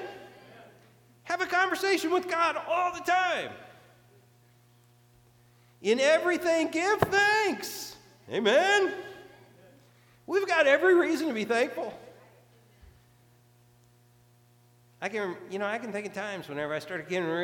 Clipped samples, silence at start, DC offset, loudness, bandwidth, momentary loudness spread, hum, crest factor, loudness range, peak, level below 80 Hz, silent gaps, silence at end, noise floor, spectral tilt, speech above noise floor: under 0.1%; 0 s; under 0.1%; -27 LUFS; 19 kHz; 15 LU; none; 22 dB; 11 LU; -8 dBFS; -68 dBFS; none; 0 s; -61 dBFS; -3.5 dB/octave; 34 dB